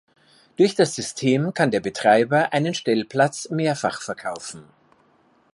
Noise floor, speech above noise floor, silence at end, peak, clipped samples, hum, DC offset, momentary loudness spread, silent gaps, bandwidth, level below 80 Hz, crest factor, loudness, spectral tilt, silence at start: -60 dBFS; 39 dB; 0.9 s; -4 dBFS; under 0.1%; none; under 0.1%; 13 LU; none; 11.5 kHz; -66 dBFS; 18 dB; -21 LUFS; -5 dB/octave; 0.6 s